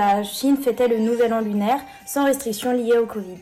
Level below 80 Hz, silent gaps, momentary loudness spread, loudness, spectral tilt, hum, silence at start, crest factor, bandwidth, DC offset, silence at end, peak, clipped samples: -60 dBFS; none; 4 LU; -21 LUFS; -4.5 dB/octave; none; 0 s; 10 dB; 15.5 kHz; under 0.1%; 0 s; -12 dBFS; under 0.1%